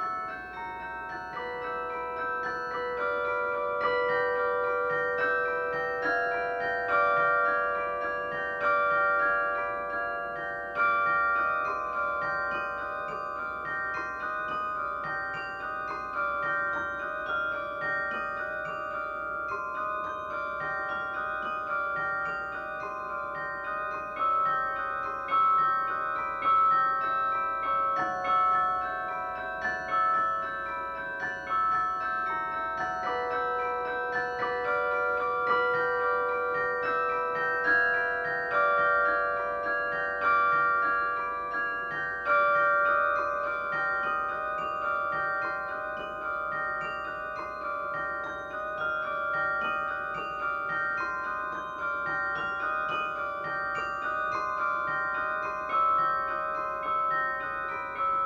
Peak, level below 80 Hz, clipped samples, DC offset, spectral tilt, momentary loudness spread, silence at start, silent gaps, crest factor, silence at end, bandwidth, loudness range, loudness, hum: -14 dBFS; -60 dBFS; under 0.1%; under 0.1%; -5 dB/octave; 9 LU; 0 s; none; 16 dB; 0 s; 7.6 kHz; 6 LU; -29 LUFS; none